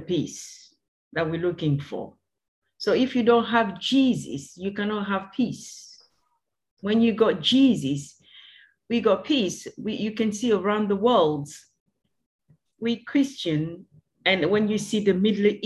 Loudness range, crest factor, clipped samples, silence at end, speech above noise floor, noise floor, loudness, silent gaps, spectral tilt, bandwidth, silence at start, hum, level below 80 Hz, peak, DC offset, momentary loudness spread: 4 LU; 18 dB; under 0.1%; 0 s; 52 dB; -75 dBFS; -24 LUFS; 0.88-1.11 s, 2.48-2.62 s, 6.71-6.77 s, 11.80-11.86 s, 12.26-12.39 s; -5.5 dB/octave; 12 kHz; 0 s; none; -62 dBFS; -6 dBFS; under 0.1%; 15 LU